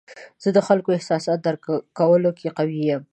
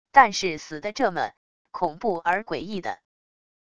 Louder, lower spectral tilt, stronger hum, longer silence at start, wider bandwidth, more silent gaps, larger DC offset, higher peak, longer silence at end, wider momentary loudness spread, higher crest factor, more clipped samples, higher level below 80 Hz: first, -21 LUFS vs -25 LUFS; first, -7 dB/octave vs -3.5 dB/octave; neither; about the same, 0.1 s vs 0.15 s; about the same, 9.6 kHz vs 10 kHz; second, none vs 1.37-1.65 s; second, under 0.1% vs 0.4%; second, -4 dBFS vs 0 dBFS; second, 0.1 s vs 0.8 s; second, 8 LU vs 14 LU; second, 18 dB vs 24 dB; neither; second, -70 dBFS vs -60 dBFS